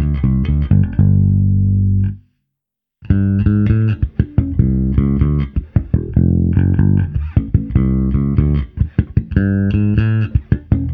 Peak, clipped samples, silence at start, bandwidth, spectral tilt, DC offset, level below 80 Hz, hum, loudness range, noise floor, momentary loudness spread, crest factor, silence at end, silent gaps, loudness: 0 dBFS; under 0.1%; 0 s; 3.5 kHz; -12 dB/octave; under 0.1%; -22 dBFS; 50 Hz at -35 dBFS; 1 LU; -81 dBFS; 5 LU; 14 dB; 0 s; none; -16 LUFS